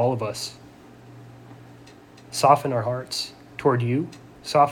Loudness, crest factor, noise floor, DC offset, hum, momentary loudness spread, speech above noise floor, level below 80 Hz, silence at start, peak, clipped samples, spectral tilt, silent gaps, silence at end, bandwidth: -24 LUFS; 22 dB; -47 dBFS; under 0.1%; none; 27 LU; 25 dB; -62 dBFS; 0 s; -2 dBFS; under 0.1%; -5 dB/octave; none; 0 s; 19 kHz